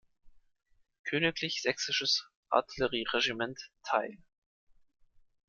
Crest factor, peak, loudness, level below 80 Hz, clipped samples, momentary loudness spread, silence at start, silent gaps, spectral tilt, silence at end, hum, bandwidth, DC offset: 24 dB; -10 dBFS; -31 LUFS; -66 dBFS; under 0.1%; 8 LU; 0.25 s; 0.99-1.04 s, 2.36-2.43 s; -3 dB/octave; 1.3 s; none; 11 kHz; under 0.1%